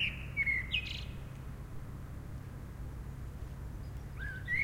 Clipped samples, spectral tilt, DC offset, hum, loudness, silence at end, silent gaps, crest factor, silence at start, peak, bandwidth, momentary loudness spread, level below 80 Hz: under 0.1%; -4.5 dB/octave; under 0.1%; none; -39 LUFS; 0 s; none; 18 dB; 0 s; -22 dBFS; 16 kHz; 15 LU; -46 dBFS